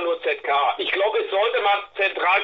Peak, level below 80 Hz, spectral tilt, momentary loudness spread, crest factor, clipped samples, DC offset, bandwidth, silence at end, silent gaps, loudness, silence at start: -8 dBFS; -66 dBFS; -3.5 dB/octave; 4 LU; 14 dB; under 0.1%; under 0.1%; 6.6 kHz; 0 s; none; -21 LUFS; 0 s